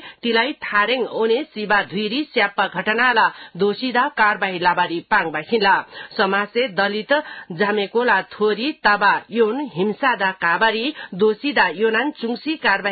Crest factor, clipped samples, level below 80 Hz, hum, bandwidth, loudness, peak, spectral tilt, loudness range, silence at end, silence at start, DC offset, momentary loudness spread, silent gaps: 16 dB; under 0.1%; -62 dBFS; none; 4.8 kHz; -19 LUFS; -2 dBFS; -9.5 dB/octave; 1 LU; 0 s; 0 s; under 0.1%; 6 LU; none